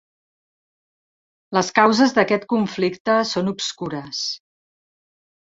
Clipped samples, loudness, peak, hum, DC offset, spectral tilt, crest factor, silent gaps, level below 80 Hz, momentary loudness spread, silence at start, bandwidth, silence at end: under 0.1%; -20 LUFS; -2 dBFS; none; under 0.1%; -4 dB/octave; 20 dB; 3.00-3.05 s; -64 dBFS; 11 LU; 1.5 s; 8 kHz; 1.1 s